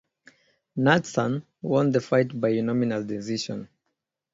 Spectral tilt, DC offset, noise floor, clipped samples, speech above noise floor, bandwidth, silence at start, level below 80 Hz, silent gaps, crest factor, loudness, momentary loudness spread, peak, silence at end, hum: -6 dB/octave; under 0.1%; -80 dBFS; under 0.1%; 56 dB; 7.8 kHz; 0.75 s; -64 dBFS; none; 22 dB; -25 LUFS; 10 LU; -4 dBFS; 0.7 s; none